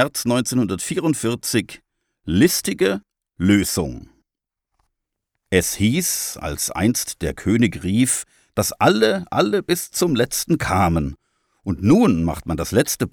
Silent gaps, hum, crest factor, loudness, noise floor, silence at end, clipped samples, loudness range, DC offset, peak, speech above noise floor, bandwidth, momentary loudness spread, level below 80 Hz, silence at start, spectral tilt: none; none; 18 dB; -20 LUFS; -85 dBFS; 0.05 s; under 0.1%; 3 LU; under 0.1%; -2 dBFS; 66 dB; over 20 kHz; 9 LU; -42 dBFS; 0 s; -4.5 dB/octave